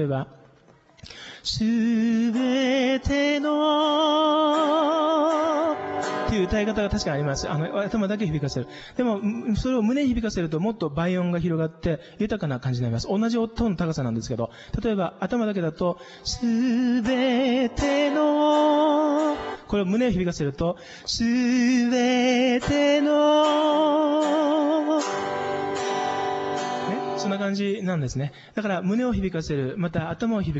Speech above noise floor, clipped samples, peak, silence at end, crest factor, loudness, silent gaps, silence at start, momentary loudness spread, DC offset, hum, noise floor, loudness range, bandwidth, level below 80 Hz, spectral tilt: 32 dB; under 0.1%; -10 dBFS; 0 s; 12 dB; -24 LUFS; none; 0 s; 8 LU; under 0.1%; none; -55 dBFS; 6 LU; 8.2 kHz; -44 dBFS; -6 dB/octave